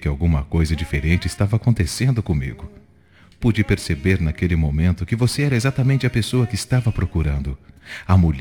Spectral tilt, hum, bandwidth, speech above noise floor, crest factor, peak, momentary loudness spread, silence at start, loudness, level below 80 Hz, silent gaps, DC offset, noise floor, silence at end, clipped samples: -6.5 dB/octave; none; 18 kHz; 32 dB; 18 dB; -2 dBFS; 7 LU; 0 s; -20 LUFS; -32 dBFS; none; 0.1%; -51 dBFS; 0 s; under 0.1%